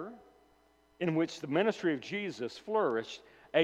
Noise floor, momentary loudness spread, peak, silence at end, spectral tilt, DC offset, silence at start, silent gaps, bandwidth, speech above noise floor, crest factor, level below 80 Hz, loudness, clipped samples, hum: -67 dBFS; 12 LU; -14 dBFS; 0 s; -6 dB/octave; under 0.1%; 0 s; none; 10 kHz; 34 dB; 20 dB; -76 dBFS; -33 LUFS; under 0.1%; none